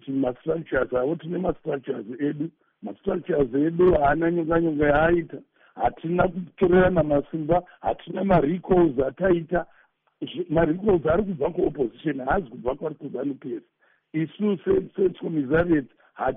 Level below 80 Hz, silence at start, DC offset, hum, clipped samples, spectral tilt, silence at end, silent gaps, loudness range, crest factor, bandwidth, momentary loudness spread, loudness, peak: -44 dBFS; 0.05 s; under 0.1%; none; under 0.1%; -4 dB/octave; 0 s; none; 5 LU; 16 dB; 3.8 kHz; 13 LU; -24 LUFS; -8 dBFS